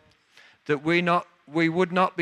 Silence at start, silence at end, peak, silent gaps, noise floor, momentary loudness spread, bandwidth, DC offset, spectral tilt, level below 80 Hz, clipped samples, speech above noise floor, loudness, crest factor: 0.7 s; 0 s; -8 dBFS; none; -56 dBFS; 8 LU; 10 kHz; under 0.1%; -6.5 dB/octave; -70 dBFS; under 0.1%; 33 dB; -24 LUFS; 18 dB